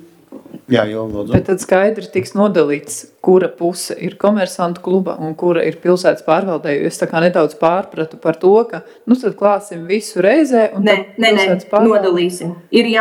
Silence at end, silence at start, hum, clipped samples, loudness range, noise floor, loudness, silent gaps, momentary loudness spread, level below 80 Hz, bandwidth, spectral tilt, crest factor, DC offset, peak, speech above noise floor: 0 s; 0.3 s; none; under 0.1%; 3 LU; -38 dBFS; -15 LUFS; none; 8 LU; -46 dBFS; 15.5 kHz; -5.5 dB/octave; 14 dB; under 0.1%; 0 dBFS; 24 dB